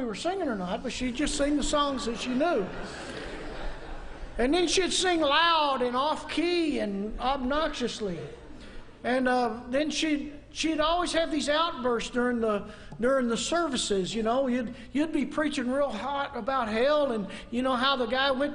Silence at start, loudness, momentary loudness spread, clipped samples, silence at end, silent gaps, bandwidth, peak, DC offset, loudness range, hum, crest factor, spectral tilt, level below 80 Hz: 0 s; -28 LUFS; 14 LU; under 0.1%; 0 s; none; 10.5 kHz; -10 dBFS; under 0.1%; 4 LU; none; 18 dB; -3.5 dB/octave; -44 dBFS